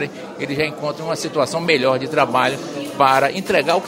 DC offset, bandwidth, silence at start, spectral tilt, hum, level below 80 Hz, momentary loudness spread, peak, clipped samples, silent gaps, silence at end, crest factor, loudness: under 0.1%; 16 kHz; 0 s; -4.5 dB/octave; none; -58 dBFS; 11 LU; 0 dBFS; under 0.1%; none; 0 s; 18 dB; -19 LUFS